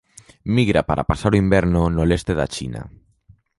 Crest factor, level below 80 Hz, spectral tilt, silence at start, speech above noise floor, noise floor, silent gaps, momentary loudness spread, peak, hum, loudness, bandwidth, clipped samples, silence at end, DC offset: 18 dB; -32 dBFS; -7 dB/octave; 0.45 s; 35 dB; -54 dBFS; none; 13 LU; -2 dBFS; none; -19 LUFS; 11.5 kHz; under 0.1%; 0.7 s; under 0.1%